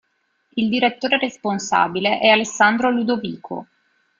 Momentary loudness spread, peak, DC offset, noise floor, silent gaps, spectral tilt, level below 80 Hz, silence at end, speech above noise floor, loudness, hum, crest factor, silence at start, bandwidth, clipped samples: 14 LU; 0 dBFS; under 0.1%; -66 dBFS; none; -3.5 dB/octave; -62 dBFS; 0.55 s; 47 dB; -18 LUFS; none; 20 dB; 0.55 s; 7.6 kHz; under 0.1%